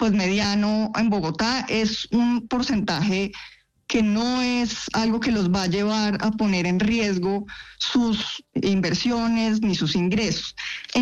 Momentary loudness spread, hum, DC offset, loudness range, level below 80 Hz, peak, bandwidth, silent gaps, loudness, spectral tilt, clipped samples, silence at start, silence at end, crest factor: 5 LU; none; under 0.1%; 1 LU; -48 dBFS; -10 dBFS; 8.2 kHz; none; -23 LUFS; -5 dB/octave; under 0.1%; 0 s; 0 s; 12 dB